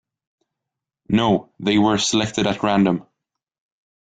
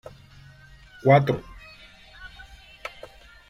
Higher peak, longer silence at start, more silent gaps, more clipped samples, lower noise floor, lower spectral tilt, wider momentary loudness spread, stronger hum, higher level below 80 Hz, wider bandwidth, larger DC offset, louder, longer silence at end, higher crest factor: about the same, -4 dBFS vs -4 dBFS; about the same, 1.1 s vs 1.05 s; neither; neither; first, -84 dBFS vs -49 dBFS; second, -4.5 dB/octave vs -8 dB/octave; second, 4 LU vs 28 LU; neither; about the same, -52 dBFS vs -52 dBFS; second, 9.4 kHz vs 11.5 kHz; neither; about the same, -19 LUFS vs -21 LUFS; first, 1 s vs 0.6 s; about the same, 18 dB vs 22 dB